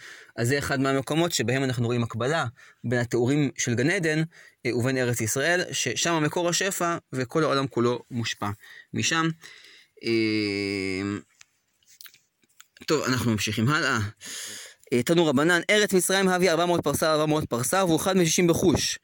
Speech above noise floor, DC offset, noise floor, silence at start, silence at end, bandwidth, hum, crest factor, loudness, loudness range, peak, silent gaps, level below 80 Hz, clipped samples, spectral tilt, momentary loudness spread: 39 dB; under 0.1%; -64 dBFS; 0 s; 0.05 s; 17 kHz; none; 18 dB; -24 LUFS; 7 LU; -8 dBFS; none; -56 dBFS; under 0.1%; -4 dB/octave; 12 LU